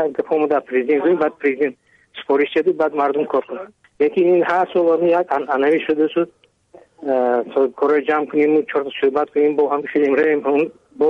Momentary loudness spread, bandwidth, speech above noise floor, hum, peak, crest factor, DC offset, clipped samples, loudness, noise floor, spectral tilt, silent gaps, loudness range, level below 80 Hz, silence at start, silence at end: 7 LU; 5.6 kHz; 31 dB; none; -4 dBFS; 14 dB; under 0.1%; under 0.1%; -18 LUFS; -49 dBFS; -7 dB/octave; none; 2 LU; -66 dBFS; 0 s; 0 s